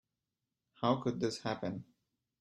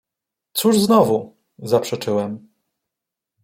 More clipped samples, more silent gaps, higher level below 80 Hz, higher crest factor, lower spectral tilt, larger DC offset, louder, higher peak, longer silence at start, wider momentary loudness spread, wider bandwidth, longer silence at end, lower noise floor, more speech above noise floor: neither; neither; second, -72 dBFS vs -62 dBFS; about the same, 22 dB vs 18 dB; about the same, -6 dB/octave vs -5 dB/octave; neither; second, -36 LUFS vs -19 LUFS; second, -16 dBFS vs -2 dBFS; first, 0.8 s vs 0.55 s; second, 9 LU vs 15 LU; second, 11.5 kHz vs 16.5 kHz; second, 0.55 s vs 1.05 s; first, -89 dBFS vs -85 dBFS; second, 54 dB vs 67 dB